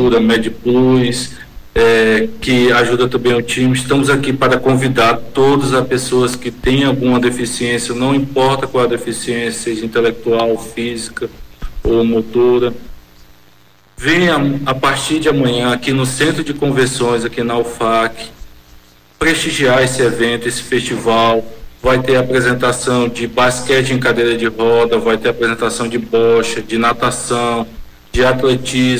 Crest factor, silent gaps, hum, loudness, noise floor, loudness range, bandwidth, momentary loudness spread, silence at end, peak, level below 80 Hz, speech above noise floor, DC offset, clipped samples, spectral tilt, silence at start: 10 dB; none; none; -14 LUFS; -49 dBFS; 4 LU; 16 kHz; 7 LU; 0 s; -4 dBFS; -36 dBFS; 35 dB; under 0.1%; under 0.1%; -4.5 dB/octave; 0 s